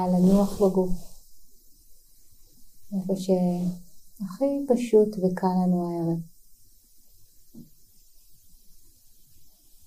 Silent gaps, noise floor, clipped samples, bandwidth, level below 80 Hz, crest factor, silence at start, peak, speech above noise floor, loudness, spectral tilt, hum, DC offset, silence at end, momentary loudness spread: none; -53 dBFS; under 0.1%; 15.5 kHz; -46 dBFS; 18 dB; 0 s; -8 dBFS; 30 dB; -25 LUFS; -8.5 dB/octave; none; under 0.1%; 0.4 s; 16 LU